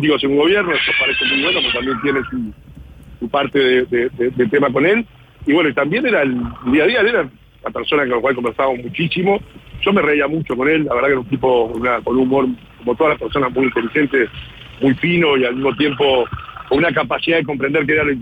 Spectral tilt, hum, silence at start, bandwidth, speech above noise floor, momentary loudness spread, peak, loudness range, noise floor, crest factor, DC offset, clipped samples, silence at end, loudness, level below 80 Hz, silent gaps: -7.5 dB/octave; none; 0 s; 8.8 kHz; 21 dB; 8 LU; -4 dBFS; 2 LU; -37 dBFS; 12 dB; under 0.1%; under 0.1%; 0 s; -16 LUFS; -44 dBFS; none